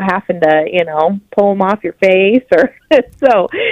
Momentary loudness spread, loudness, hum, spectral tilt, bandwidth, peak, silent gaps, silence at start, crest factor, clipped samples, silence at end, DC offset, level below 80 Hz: 5 LU; -12 LUFS; none; -7 dB/octave; 8.4 kHz; 0 dBFS; none; 0 s; 12 dB; 0.2%; 0 s; under 0.1%; -50 dBFS